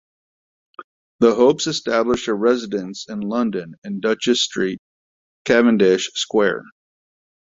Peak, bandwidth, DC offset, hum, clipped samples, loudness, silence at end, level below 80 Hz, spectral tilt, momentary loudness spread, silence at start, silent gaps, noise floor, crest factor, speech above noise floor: -2 dBFS; 7.8 kHz; under 0.1%; none; under 0.1%; -19 LUFS; 0.85 s; -56 dBFS; -4 dB/octave; 14 LU; 0.8 s; 0.84-1.19 s, 3.78-3.82 s, 4.79-5.45 s; under -90 dBFS; 18 dB; over 72 dB